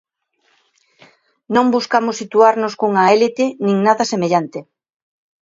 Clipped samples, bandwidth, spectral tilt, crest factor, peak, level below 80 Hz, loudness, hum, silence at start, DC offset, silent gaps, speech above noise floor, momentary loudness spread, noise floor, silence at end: under 0.1%; 7.8 kHz; -5 dB/octave; 16 dB; 0 dBFS; -66 dBFS; -15 LUFS; none; 1.5 s; under 0.1%; none; 48 dB; 6 LU; -63 dBFS; 0.8 s